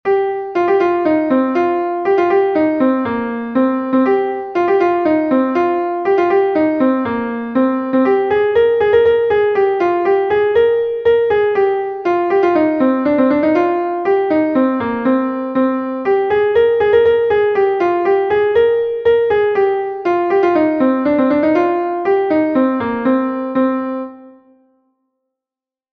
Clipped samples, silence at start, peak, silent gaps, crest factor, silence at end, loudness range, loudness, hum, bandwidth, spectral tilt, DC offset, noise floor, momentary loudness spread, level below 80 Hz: under 0.1%; 0.05 s; -2 dBFS; none; 12 dB; 1.6 s; 2 LU; -15 LUFS; none; 6.2 kHz; -7.5 dB/octave; under 0.1%; -89 dBFS; 5 LU; -52 dBFS